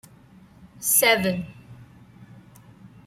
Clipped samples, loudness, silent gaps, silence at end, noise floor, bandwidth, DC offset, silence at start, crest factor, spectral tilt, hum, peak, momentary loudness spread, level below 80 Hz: under 0.1%; -20 LUFS; none; 0.2 s; -51 dBFS; 16 kHz; under 0.1%; 0.8 s; 22 dB; -2.5 dB/octave; none; -6 dBFS; 16 LU; -60 dBFS